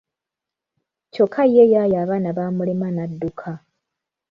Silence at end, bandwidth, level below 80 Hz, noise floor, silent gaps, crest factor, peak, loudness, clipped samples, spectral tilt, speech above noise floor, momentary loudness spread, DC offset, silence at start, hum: 0.75 s; 5.4 kHz; -60 dBFS; -86 dBFS; none; 18 dB; -2 dBFS; -19 LUFS; under 0.1%; -10 dB/octave; 68 dB; 20 LU; under 0.1%; 1.15 s; none